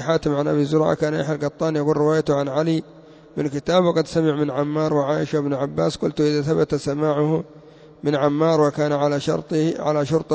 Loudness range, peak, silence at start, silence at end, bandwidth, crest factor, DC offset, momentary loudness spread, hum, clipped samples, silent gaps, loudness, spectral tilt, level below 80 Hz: 1 LU; -6 dBFS; 0 s; 0 s; 8 kHz; 14 dB; under 0.1%; 5 LU; none; under 0.1%; none; -21 LUFS; -7 dB/octave; -52 dBFS